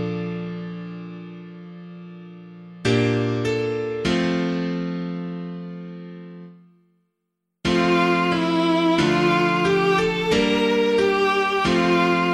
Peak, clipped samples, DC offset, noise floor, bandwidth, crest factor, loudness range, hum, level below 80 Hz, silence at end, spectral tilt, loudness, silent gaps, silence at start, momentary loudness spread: -6 dBFS; under 0.1%; under 0.1%; -78 dBFS; 12.5 kHz; 16 dB; 9 LU; none; -50 dBFS; 0 s; -6 dB/octave; -21 LUFS; none; 0 s; 21 LU